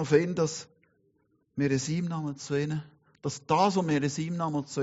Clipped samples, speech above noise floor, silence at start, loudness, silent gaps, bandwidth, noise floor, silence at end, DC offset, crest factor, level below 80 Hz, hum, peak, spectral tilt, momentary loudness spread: under 0.1%; 43 dB; 0 s; -29 LUFS; none; 8 kHz; -71 dBFS; 0 s; under 0.1%; 20 dB; -66 dBFS; none; -8 dBFS; -6 dB/octave; 12 LU